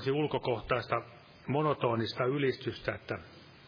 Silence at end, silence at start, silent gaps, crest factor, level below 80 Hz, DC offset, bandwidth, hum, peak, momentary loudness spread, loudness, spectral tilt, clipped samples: 0 s; 0 s; none; 20 dB; -60 dBFS; under 0.1%; 5.2 kHz; none; -14 dBFS; 11 LU; -33 LUFS; -8 dB/octave; under 0.1%